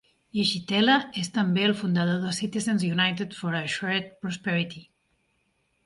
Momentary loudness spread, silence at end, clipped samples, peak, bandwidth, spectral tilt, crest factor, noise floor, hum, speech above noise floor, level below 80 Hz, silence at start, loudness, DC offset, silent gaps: 9 LU; 1.05 s; under 0.1%; -8 dBFS; 11.5 kHz; -5 dB/octave; 20 dB; -72 dBFS; none; 46 dB; -66 dBFS; 0.35 s; -26 LUFS; under 0.1%; none